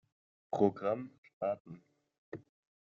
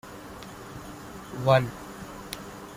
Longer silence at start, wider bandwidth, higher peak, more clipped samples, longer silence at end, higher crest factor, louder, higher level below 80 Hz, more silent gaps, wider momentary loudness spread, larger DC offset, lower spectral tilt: first, 0.5 s vs 0.05 s; second, 7.2 kHz vs 16 kHz; second, -14 dBFS vs -8 dBFS; neither; first, 0.5 s vs 0 s; about the same, 24 dB vs 24 dB; second, -36 LUFS vs -27 LUFS; second, -78 dBFS vs -54 dBFS; first, 1.18-1.23 s, 1.33-1.41 s, 1.60-1.65 s, 2.18-2.32 s vs none; about the same, 20 LU vs 19 LU; neither; first, -7.5 dB/octave vs -6 dB/octave